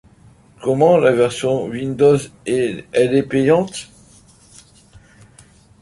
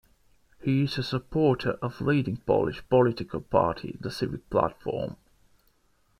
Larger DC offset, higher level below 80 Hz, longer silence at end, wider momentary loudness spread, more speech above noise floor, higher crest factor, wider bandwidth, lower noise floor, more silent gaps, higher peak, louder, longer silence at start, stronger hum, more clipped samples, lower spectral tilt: neither; about the same, -52 dBFS vs -52 dBFS; first, 2 s vs 1.05 s; about the same, 10 LU vs 10 LU; second, 32 dB vs 40 dB; about the same, 16 dB vs 20 dB; second, 11.5 kHz vs 14 kHz; second, -48 dBFS vs -67 dBFS; neither; first, -2 dBFS vs -8 dBFS; first, -17 LUFS vs -27 LUFS; about the same, 0.6 s vs 0.6 s; neither; neither; second, -6 dB/octave vs -7.5 dB/octave